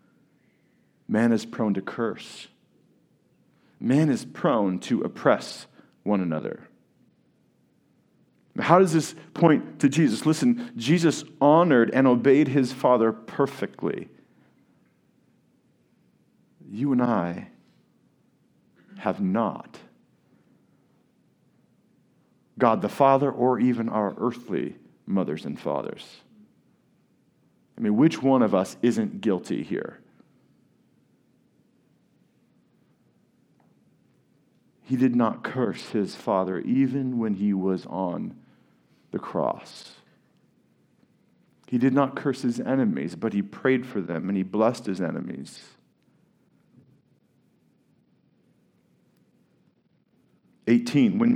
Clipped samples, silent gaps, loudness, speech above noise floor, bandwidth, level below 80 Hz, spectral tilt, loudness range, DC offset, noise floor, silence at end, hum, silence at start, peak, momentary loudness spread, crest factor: under 0.1%; none; -24 LUFS; 43 dB; 13.5 kHz; -76 dBFS; -7 dB/octave; 12 LU; under 0.1%; -66 dBFS; 0 s; none; 1.1 s; -2 dBFS; 16 LU; 26 dB